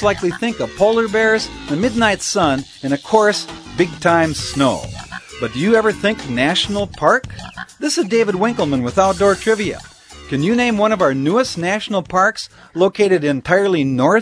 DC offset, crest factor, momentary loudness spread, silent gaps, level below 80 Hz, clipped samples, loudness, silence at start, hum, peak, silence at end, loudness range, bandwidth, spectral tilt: under 0.1%; 16 dB; 10 LU; none; -44 dBFS; under 0.1%; -16 LUFS; 0 s; none; 0 dBFS; 0 s; 1 LU; 11 kHz; -4.5 dB/octave